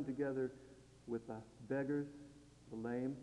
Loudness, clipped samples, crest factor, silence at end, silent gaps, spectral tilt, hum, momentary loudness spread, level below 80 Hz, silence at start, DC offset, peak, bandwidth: -44 LUFS; under 0.1%; 16 dB; 0 s; none; -8 dB/octave; none; 20 LU; -72 dBFS; 0 s; under 0.1%; -28 dBFS; 11 kHz